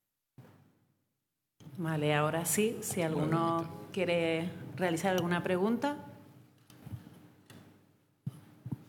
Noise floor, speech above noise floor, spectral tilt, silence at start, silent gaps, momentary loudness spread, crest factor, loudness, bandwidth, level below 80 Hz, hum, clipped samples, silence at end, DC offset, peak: -85 dBFS; 54 dB; -5 dB/octave; 0.4 s; none; 18 LU; 20 dB; -32 LUFS; 19 kHz; -76 dBFS; none; under 0.1%; 0.05 s; under 0.1%; -14 dBFS